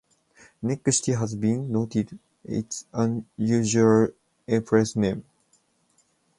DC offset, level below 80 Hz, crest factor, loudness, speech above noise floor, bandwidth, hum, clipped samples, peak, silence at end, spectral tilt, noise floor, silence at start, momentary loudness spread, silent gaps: under 0.1%; -58 dBFS; 20 dB; -25 LUFS; 43 dB; 11.5 kHz; none; under 0.1%; -6 dBFS; 1.2 s; -5.5 dB/octave; -66 dBFS; 0.6 s; 12 LU; none